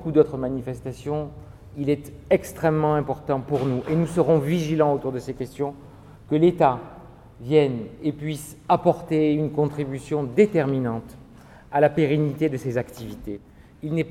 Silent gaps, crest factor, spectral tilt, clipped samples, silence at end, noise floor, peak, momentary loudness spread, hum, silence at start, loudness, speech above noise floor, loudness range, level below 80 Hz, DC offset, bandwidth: none; 20 dB; -7.5 dB/octave; under 0.1%; 0 s; -47 dBFS; -4 dBFS; 14 LU; none; 0 s; -23 LUFS; 24 dB; 3 LU; -50 dBFS; under 0.1%; 15 kHz